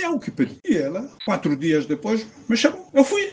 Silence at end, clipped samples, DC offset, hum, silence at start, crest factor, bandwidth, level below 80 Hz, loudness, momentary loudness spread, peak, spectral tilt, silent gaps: 0 s; under 0.1%; under 0.1%; none; 0 s; 20 dB; 9.6 kHz; -62 dBFS; -22 LUFS; 7 LU; -2 dBFS; -5 dB/octave; none